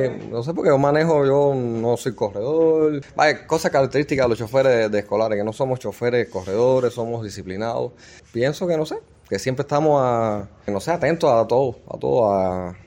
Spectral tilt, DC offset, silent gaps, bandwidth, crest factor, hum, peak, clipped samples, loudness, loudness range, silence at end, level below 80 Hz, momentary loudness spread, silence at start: -6.5 dB/octave; under 0.1%; none; 16.5 kHz; 18 dB; none; -2 dBFS; under 0.1%; -21 LUFS; 4 LU; 0.1 s; -54 dBFS; 10 LU; 0 s